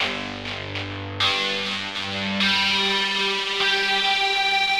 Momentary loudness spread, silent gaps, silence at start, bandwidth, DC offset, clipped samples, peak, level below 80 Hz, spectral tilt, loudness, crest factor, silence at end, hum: 11 LU; none; 0 s; 16 kHz; 0.2%; under 0.1%; -8 dBFS; -56 dBFS; -2.5 dB/octave; -21 LUFS; 14 dB; 0 s; none